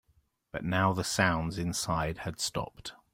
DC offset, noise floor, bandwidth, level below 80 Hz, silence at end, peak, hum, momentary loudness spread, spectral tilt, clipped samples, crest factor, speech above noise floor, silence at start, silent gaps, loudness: under 0.1%; -70 dBFS; 16.5 kHz; -52 dBFS; 0.2 s; -8 dBFS; none; 12 LU; -4 dB/octave; under 0.1%; 24 dB; 39 dB; 0.55 s; none; -31 LUFS